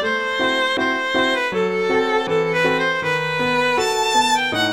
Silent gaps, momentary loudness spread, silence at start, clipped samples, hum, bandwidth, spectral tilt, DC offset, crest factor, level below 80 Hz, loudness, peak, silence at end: none; 3 LU; 0 s; under 0.1%; none; 16.5 kHz; -3 dB/octave; 0.3%; 14 dB; -56 dBFS; -18 LUFS; -6 dBFS; 0 s